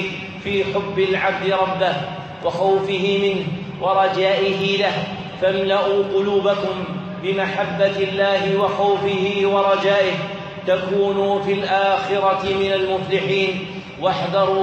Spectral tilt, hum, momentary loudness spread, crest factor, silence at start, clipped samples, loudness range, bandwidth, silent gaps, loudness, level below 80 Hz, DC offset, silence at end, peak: -6 dB/octave; none; 8 LU; 14 dB; 0 s; under 0.1%; 1 LU; 8.2 kHz; none; -19 LUFS; -56 dBFS; under 0.1%; 0 s; -4 dBFS